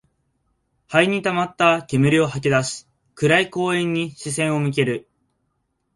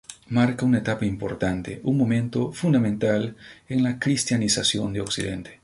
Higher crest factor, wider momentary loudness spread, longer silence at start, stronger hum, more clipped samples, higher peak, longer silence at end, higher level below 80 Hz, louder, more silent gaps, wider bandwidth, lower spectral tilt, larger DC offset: about the same, 20 dB vs 18 dB; about the same, 7 LU vs 7 LU; first, 0.9 s vs 0.1 s; neither; neither; first, -2 dBFS vs -6 dBFS; first, 0.95 s vs 0.1 s; second, -58 dBFS vs -50 dBFS; first, -20 LUFS vs -24 LUFS; neither; about the same, 11.5 kHz vs 11.5 kHz; about the same, -5 dB/octave vs -5 dB/octave; neither